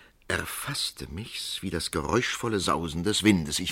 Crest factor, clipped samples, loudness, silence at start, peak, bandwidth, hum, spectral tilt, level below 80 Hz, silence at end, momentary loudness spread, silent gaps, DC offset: 24 dB; under 0.1%; -28 LUFS; 0.3 s; -6 dBFS; 16.5 kHz; none; -4 dB/octave; -48 dBFS; 0 s; 9 LU; none; under 0.1%